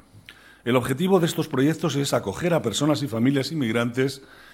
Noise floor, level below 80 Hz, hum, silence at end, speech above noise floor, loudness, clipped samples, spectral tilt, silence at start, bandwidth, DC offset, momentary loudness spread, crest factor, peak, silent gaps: -49 dBFS; -58 dBFS; none; 0.3 s; 26 dB; -23 LUFS; under 0.1%; -5.5 dB/octave; 0.15 s; 16.5 kHz; under 0.1%; 4 LU; 18 dB; -6 dBFS; none